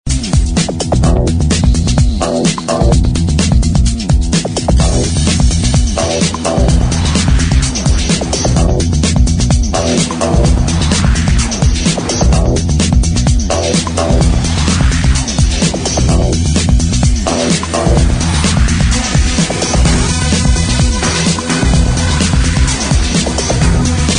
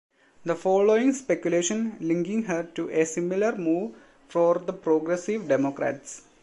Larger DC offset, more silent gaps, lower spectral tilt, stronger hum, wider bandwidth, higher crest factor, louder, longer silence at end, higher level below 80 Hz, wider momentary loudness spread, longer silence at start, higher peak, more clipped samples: neither; neither; about the same, -4.5 dB/octave vs -5 dB/octave; neither; about the same, 10.5 kHz vs 11.5 kHz; second, 10 dB vs 16 dB; first, -12 LUFS vs -25 LUFS; second, 0 s vs 0.25 s; first, -14 dBFS vs -70 dBFS; second, 2 LU vs 9 LU; second, 0.05 s vs 0.45 s; first, 0 dBFS vs -10 dBFS; neither